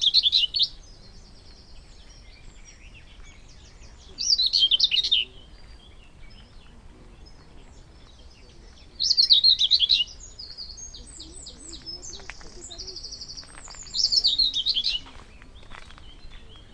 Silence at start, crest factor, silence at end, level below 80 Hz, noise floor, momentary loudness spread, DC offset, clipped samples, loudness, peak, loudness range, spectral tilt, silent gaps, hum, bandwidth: 0 s; 22 dB; 0.15 s; -48 dBFS; -48 dBFS; 24 LU; under 0.1%; under 0.1%; -19 LUFS; -4 dBFS; 14 LU; 0.5 dB/octave; none; none; 10.5 kHz